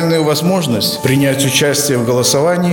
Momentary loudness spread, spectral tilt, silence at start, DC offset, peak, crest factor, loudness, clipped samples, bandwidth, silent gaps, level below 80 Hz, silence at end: 3 LU; -4 dB/octave; 0 s; under 0.1%; 0 dBFS; 12 dB; -13 LUFS; under 0.1%; over 20 kHz; none; -50 dBFS; 0 s